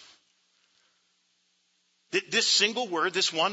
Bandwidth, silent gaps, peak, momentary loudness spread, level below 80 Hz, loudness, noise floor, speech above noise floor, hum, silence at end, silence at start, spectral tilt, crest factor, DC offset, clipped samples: 8.2 kHz; none; -10 dBFS; 9 LU; -88 dBFS; -25 LUFS; -71 dBFS; 45 dB; none; 0 s; 2.15 s; -1 dB/octave; 20 dB; under 0.1%; under 0.1%